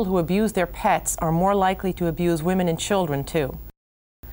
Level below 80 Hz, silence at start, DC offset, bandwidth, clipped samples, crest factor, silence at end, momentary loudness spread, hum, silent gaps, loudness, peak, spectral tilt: -40 dBFS; 0 s; under 0.1%; 20 kHz; under 0.1%; 14 dB; 0 s; 5 LU; none; 3.77-4.23 s; -23 LUFS; -8 dBFS; -5.5 dB/octave